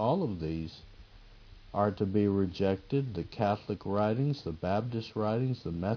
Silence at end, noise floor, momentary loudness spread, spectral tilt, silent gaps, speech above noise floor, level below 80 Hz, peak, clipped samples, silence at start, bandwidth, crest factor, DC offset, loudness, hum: 0 s; -53 dBFS; 8 LU; -9 dB/octave; none; 22 dB; -54 dBFS; -14 dBFS; under 0.1%; 0 s; 5.4 kHz; 18 dB; under 0.1%; -32 LUFS; none